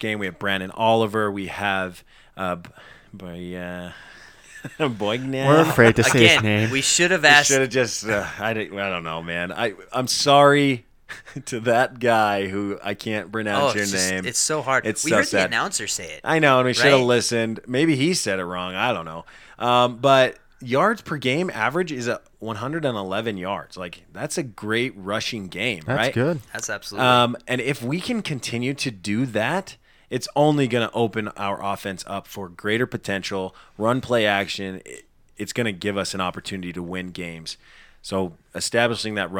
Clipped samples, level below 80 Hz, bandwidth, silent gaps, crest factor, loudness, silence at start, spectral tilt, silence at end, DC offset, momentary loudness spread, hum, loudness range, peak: under 0.1%; -54 dBFS; 19 kHz; none; 22 dB; -21 LUFS; 0 s; -4 dB/octave; 0 s; under 0.1%; 16 LU; none; 10 LU; 0 dBFS